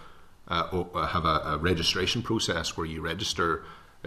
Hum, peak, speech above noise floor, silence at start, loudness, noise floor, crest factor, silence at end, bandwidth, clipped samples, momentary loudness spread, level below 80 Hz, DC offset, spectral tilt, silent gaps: none; -10 dBFS; 20 dB; 0 s; -28 LUFS; -48 dBFS; 18 dB; 0 s; 14 kHz; under 0.1%; 7 LU; -46 dBFS; under 0.1%; -4 dB/octave; none